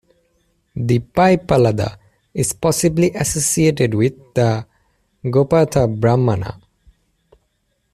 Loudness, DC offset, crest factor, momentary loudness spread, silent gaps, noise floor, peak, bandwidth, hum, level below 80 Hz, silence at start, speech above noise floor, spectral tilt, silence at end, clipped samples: -17 LUFS; under 0.1%; 14 dB; 11 LU; none; -67 dBFS; -2 dBFS; 14.5 kHz; none; -44 dBFS; 0.75 s; 51 dB; -5.5 dB/octave; 1.35 s; under 0.1%